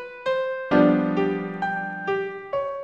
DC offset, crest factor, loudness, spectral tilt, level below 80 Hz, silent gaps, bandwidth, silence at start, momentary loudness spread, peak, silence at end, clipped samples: under 0.1%; 18 dB; -24 LUFS; -8 dB/octave; -60 dBFS; none; 6.8 kHz; 0 s; 10 LU; -6 dBFS; 0 s; under 0.1%